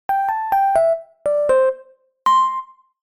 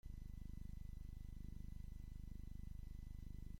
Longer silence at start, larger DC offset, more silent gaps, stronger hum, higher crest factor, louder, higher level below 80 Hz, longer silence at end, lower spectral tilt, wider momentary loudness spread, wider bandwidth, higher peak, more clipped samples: about the same, 0.1 s vs 0.05 s; neither; neither; second, none vs 50 Hz at -55 dBFS; about the same, 14 dB vs 12 dB; first, -18 LUFS vs -56 LUFS; about the same, -56 dBFS vs -52 dBFS; first, 0.5 s vs 0 s; second, -3 dB/octave vs -7.5 dB/octave; first, 7 LU vs 1 LU; about the same, 17.5 kHz vs 16.5 kHz; first, -6 dBFS vs -38 dBFS; neither